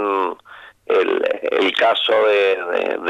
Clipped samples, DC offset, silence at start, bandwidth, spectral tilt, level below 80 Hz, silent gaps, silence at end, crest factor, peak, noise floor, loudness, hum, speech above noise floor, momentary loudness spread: under 0.1%; under 0.1%; 0 s; 10.5 kHz; -3.5 dB/octave; -68 dBFS; none; 0 s; 14 dB; -4 dBFS; -43 dBFS; -17 LUFS; none; 26 dB; 7 LU